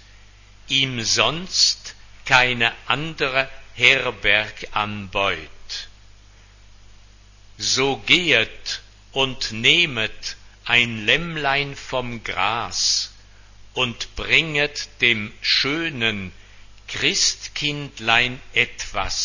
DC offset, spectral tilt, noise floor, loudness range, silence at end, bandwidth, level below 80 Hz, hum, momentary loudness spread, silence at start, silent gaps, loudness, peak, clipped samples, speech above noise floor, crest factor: under 0.1%; -2 dB/octave; -48 dBFS; 4 LU; 0 s; 8 kHz; -46 dBFS; 50 Hz at -50 dBFS; 14 LU; 0.65 s; none; -19 LUFS; 0 dBFS; under 0.1%; 26 dB; 22 dB